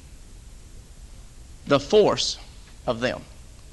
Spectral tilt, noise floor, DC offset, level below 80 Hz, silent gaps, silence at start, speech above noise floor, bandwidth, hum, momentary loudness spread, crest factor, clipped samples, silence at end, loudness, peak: -4 dB/octave; -44 dBFS; under 0.1%; -44 dBFS; none; 0.05 s; 22 dB; 12 kHz; none; 19 LU; 22 dB; under 0.1%; 0.05 s; -23 LUFS; -4 dBFS